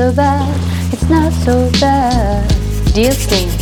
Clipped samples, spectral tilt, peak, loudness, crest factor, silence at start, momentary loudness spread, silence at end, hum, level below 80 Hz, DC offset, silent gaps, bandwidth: under 0.1%; -5.5 dB/octave; 0 dBFS; -13 LUFS; 12 dB; 0 s; 5 LU; 0 s; none; -18 dBFS; under 0.1%; none; 18.5 kHz